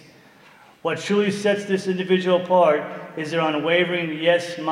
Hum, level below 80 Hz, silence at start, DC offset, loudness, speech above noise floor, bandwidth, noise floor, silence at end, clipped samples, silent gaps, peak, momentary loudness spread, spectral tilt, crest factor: none; -72 dBFS; 0.85 s; under 0.1%; -21 LUFS; 30 dB; 12 kHz; -50 dBFS; 0 s; under 0.1%; none; -6 dBFS; 9 LU; -5.5 dB/octave; 16 dB